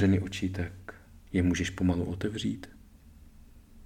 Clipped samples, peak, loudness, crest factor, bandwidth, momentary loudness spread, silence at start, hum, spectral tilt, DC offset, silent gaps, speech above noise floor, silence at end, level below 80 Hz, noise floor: under 0.1%; -14 dBFS; -31 LUFS; 18 dB; 13 kHz; 17 LU; 0 s; none; -6 dB/octave; under 0.1%; none; 24 dB; 0 s; -50 dBFS; -53 dBFS